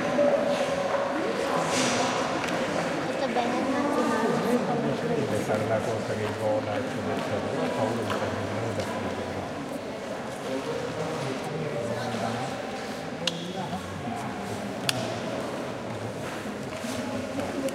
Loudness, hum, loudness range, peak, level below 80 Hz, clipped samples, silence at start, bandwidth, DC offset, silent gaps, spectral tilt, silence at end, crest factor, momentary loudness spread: -29 LUFS; none; 6 LU; -4 dBFS; -60 dBFS; under 0.1%; 0 s; 16 kHz; under 0.1%; none; -4.5 dB/octave; 0 s; 24 dB; 9 LU